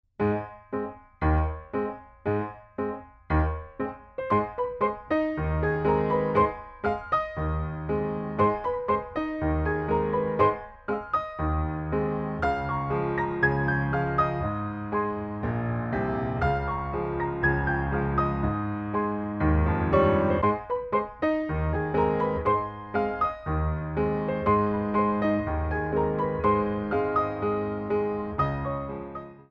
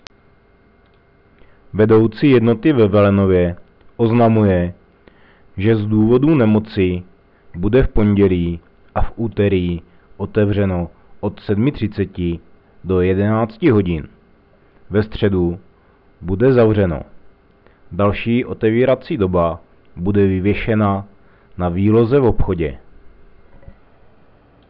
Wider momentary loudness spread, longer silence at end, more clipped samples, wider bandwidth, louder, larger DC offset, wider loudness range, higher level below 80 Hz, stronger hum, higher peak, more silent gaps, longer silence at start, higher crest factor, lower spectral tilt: second, 8 LU vs 14 LU; second, 0.1 s vs 1.6 s; neither; about the same, 5.4 kHz vs 5.4 kHz; second, -27 LUFS vs -16 LUFS; neither; about the same, 4 LU vs 5 LU; about the same, -38 dBFS vs -34 dBFS; neither; second, -8 dBFS vs -4 dBFS; neither; second, 0.2 s vs 1.75 s; first, 18 dB vs 12 dB; about the same, -10 dB/octave vs -11 dB/octave